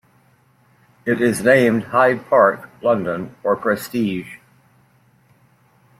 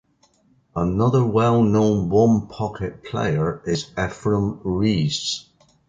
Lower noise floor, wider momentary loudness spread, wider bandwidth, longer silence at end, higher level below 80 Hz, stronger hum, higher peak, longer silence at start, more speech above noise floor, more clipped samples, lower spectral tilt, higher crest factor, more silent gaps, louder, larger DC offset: about the same, -57 dBFS vs -60 dBFS; about the same, 11 LU vs 10 LU; first, 16 kHz vs 9.2 kHz; first, 1.65 s vs 0.5 s; second, -60 dBFS vs -44 dBFS; neither; about the same, -2 dBFS vs -4 dBFS; first, 1.05 s vs 0.75 s; about the same, 39 dB vs 40 dB; neither; about the same, -6 dB/octave vs -6.5 dB/octave; about the same, 18 dB vs 16 dB; neither; first, -18 LUFS vs -21 LUFS; neither